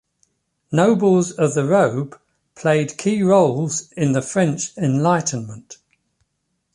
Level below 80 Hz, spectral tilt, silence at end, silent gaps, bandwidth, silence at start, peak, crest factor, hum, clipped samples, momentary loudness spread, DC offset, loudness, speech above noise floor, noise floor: -60 dBFS; -6 dB/octave; 1 s; none; 11.5 kHz; 0.7 s; -2 dBFS; 16 dB; none; under 0.1%; 10 LU; under 0.1%; -18 LUFS; 55 dB; -73 dBFS